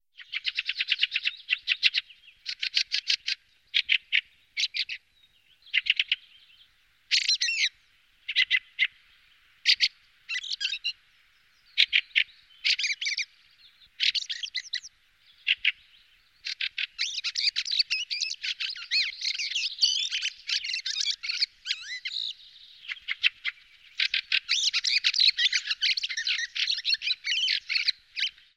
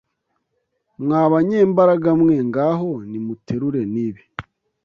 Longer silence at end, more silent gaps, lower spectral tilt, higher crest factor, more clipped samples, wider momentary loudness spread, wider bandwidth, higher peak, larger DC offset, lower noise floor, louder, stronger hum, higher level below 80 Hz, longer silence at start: second, 0.25 s vs 0.45 s; neither; second, 5.5 dB/octave vs -10 dB/octave; first, 24 dB vs 16 dB; neither; second, 11 LU vs 14 LU; first, 16 kHz vs 6.8 kHz; second, -6 dBFS vs -2 dBFS; neither; second, -64 dBFS vs -72 dBFS; second, -26 LUFS vs -18 LUFS; neither; second, -74 dBFS vs -56 dBFS; second, 0.2 s vs 1 s